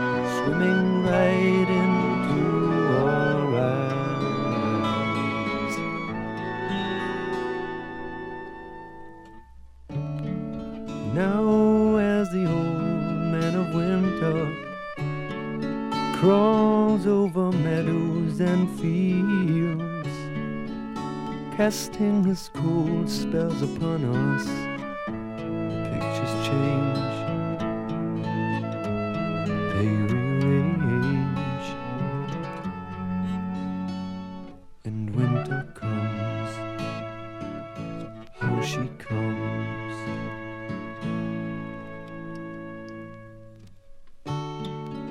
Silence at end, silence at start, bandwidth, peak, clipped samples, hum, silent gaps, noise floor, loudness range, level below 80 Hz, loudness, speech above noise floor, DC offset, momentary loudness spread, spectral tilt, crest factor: 0 s; 0 s; 15.5 kHz; -8 dBFS; under 0.1%; none; none; -46 dBFS; 10 LU; -52 dBFS; -26 LUFS; 23 dB; under 0.1%; 14 LU; -7 dB/octave; 18 dB